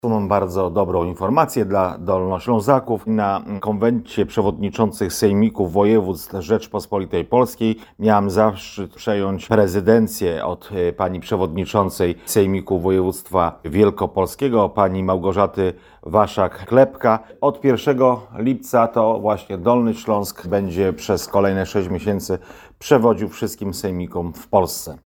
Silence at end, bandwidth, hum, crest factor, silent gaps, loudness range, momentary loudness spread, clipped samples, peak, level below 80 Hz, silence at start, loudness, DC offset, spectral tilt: 0.1 s; 19.5 kHz; none; 18 dB; none; 2 LU; 8 LU; under 0.1%; 0 dBFS; -46 dBFS; 0.05 s; -19 LUFS; under 0.1%; -6.5 dB/octave